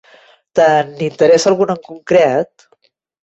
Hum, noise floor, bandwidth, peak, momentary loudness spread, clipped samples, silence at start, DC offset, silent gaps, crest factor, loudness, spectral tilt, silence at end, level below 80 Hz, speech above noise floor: none; -58 dBFS; 8.2 kHz; -2 dBFS; 10 LU; under 0.1%; 0.55 s; under 0.1%; none; 14 dB; -14 LUFS; -5 dB/octave; 0.75 s; -58 dBFS; 45 dB